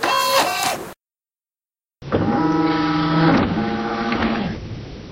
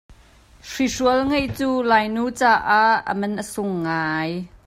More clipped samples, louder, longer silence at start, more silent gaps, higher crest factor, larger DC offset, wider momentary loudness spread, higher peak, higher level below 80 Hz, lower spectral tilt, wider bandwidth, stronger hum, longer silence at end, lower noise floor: neither; about the same, -19 LUFS vs -20 LUFS; about the same, 0 s vs 0.1 s; neither; about the same, 18 dB vs 18 dB; neither; first, 15 LU vs 10 LU; about the same, -4 dBFS vs -4 dBFS; first, -42 dBFS vs -48 dBFS; about the same, -5 dB/octave vs -4.5 dB/octave; about the same, 16 kHz vs 16 kHz; neither; about the same, 0 s vs 0.1 s; first, under -90 dBFS vs -50 dBFS